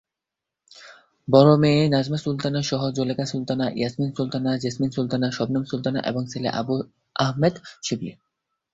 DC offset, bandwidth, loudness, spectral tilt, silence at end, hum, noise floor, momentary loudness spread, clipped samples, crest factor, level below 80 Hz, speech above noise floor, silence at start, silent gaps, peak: under 0.1%; 8 kHz; -23 LUFS; -6.5 dB/octave; 0.6 s; none; -86 dBFS; 12 LU; under 0.1%; 22 dB; -58 dBFS; 64 dB; 0.75 s; none; -2 dBFS